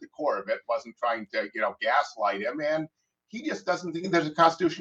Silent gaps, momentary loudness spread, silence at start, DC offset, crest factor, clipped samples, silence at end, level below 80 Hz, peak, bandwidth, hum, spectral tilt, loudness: none; 10 LU; 0 s; under 0.1%; 20 dB; under 0.1%; 0 s; -74 dBFS; -8 dBFS; 8.2 kHz; none; -5 dB/octave; -28 LUFS